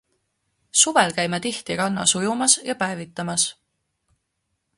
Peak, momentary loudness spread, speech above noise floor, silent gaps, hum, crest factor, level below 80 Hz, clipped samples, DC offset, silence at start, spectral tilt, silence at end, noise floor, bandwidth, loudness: -2 dBFS; 10 LU; 54 dB; none; none; 22 dB; -62 dBFS; under 0.1%; under 0.1%; 0.75 s; -2 dB/octave; 1.25 s; -76 dBFS; 11.5 kHz; -20 LUFS